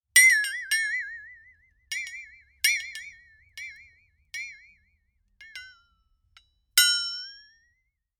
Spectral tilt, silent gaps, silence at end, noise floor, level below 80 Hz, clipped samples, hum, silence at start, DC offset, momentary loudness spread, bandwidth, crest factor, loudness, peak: 5.5 dB/octave; none; 0.85 s; -75 dBFS; -68 dBFS; under 0.1%; none; 0.15 s; under 0.1%; 25 LU; over 20 kHz; 28 dB; -23 LUFS; -2 dBFS